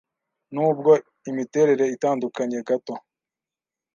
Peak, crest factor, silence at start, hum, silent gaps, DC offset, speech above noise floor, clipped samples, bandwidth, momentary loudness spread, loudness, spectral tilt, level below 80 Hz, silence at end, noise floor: -4 dBFS; 18 dB; 0.5 s; none; none; under 0.1%; 68 dB; under 0.1%; 7.2 kHz; 14 LU; -22 LUFS; -6.5 dB/octave; -78 dBFS; 0.95 s; -90 dBFS